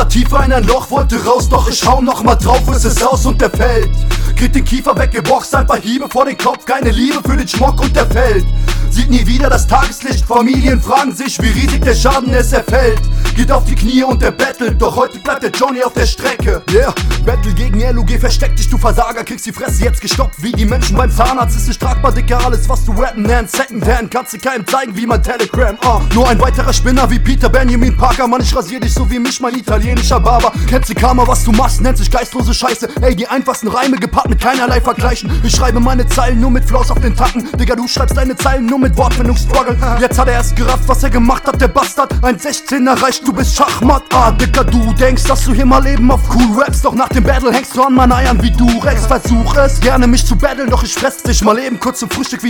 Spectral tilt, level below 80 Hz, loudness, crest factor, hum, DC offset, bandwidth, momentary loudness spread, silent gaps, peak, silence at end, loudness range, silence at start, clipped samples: -5 dB/octave; -14 dBFS; -12 LUFS; 10 dB; none; under 0.1%; 19 kHz; 5 LU; none; 0 dBFS; 0 s; 3 LU; 0 s; 0.5%